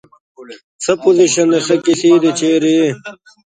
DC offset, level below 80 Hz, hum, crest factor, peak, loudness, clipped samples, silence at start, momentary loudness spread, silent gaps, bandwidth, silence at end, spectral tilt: under 0.1%; -60 dBFS; none; 14 dB; 0 dBFS; -13 LUFS; under 0.1%; 0.4 s; 9 LU; 0.64-0.79 s; 9.6 kHz; 0.35 s; -4 dB/octave